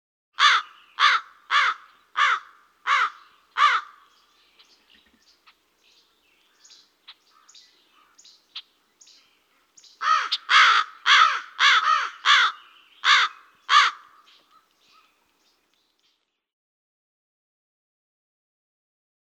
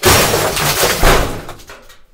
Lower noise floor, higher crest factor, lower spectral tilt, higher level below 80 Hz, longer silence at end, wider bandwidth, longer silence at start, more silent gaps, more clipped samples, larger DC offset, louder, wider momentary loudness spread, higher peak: first, -71 dBFS vs -37 dBFS; first, 22 dB vs 12 dB; second, 5.5 dB/octave vs -3 dB/octave; second, -88 dBFS vs -22 dBFS; first, 5.3 s vs 0.4 s; second, 10 kHz vs over 20 kHz; first, 0.4 s vs 0 s; neither; neither; neither; second, -20 LUFS vs -12 LUFS; about the same, 17 LU vs 16 LU; about the same, -4 dBFS vs -2 dBFS